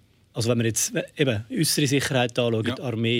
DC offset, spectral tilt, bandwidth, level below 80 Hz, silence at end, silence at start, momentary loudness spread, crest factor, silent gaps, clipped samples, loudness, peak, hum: under 0.1%; -4 dB/octave; 16.5 kHz; -62 dBFS; 0 s; 0.35 s; 5 LU; 16 dB; none; under 0.1%; -24 LUFS; -8 dBFS; none